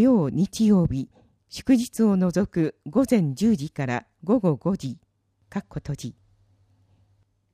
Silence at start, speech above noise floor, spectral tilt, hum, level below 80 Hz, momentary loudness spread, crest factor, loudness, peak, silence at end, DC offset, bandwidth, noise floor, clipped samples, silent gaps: 0 s; 42 dB; -7 dB/octave; none; -52 dBFS; 15 LU; 16 dB; -24 LUFS; -8 dBFS; 1.4 s; under 0.1%; 15 kHz; -65 dBFS; under 0.1%; none